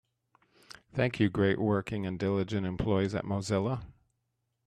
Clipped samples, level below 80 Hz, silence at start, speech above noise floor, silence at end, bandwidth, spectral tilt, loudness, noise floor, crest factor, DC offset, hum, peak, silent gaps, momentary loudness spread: under 0.1%; -56 dBFS; 0.95 s; 51 dB; 0.75 s; 10.5 kHz; -7 dB/octave; -31 LUFS; -81 dBFS; 18 dB; under 0.1%; none; -12 dBFS; none; 7 LU